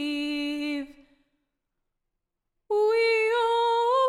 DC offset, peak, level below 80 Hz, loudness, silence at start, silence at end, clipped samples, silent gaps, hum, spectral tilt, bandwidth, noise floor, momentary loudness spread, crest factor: under 0.1%; -14 dBFS; -66 dBFS; -25 LUFS; 0 s; 0 s; under 0.1%; none; none; -2 dB/octave; 13 kHz; -82 dBFS; 10 LU; 14 dB